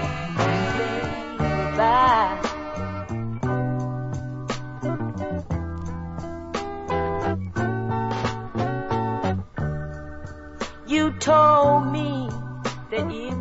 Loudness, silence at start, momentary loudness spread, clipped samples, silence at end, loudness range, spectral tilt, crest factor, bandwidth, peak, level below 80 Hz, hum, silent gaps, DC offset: -24 LUFS; 0 s; 15 LU; under 0.1%; 0 s; 7 LU; -6.5 dB/octave; 16 dB; 8 kHz; -8 dBFS; -42 dBFS; none; none; under 0.1%